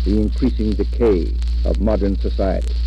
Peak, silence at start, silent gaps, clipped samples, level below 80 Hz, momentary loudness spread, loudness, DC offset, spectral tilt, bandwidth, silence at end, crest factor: -6 dBFS; 0 s; none; under 0.1%; -20 dBFS; 4 LU; -19 LUFS; under 0.1%; -9 dB/octave; 5.8 kHz; 0 s; 12 dB